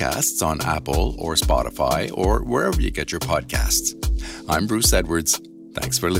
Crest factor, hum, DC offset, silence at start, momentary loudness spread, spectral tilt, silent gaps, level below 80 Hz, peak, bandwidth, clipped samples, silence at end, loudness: 16 dB; none; under 0.1%; 0 s; 7 LU; -3.5 dB/octave; none; -28 dBFS; -6 dBFS; 16.5 kHz; under 0.1%; 0 s; -21 LUFS